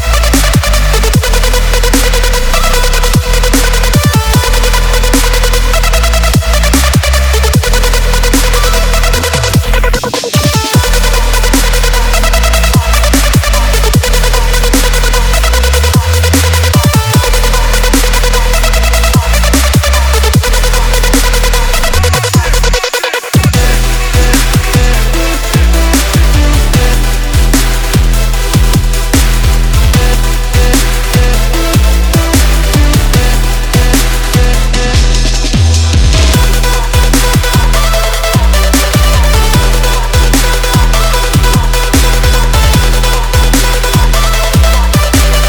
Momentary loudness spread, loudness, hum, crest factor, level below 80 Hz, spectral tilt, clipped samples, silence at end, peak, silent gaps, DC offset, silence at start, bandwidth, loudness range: 2 LU; -9 LUFS; none; 8 dB; -10 dBFS; -4 dB/octave; under 0.1%; 0 s; 0 dBFS; none; under 0.1%; 0 s; over 20 kHz; 1 LU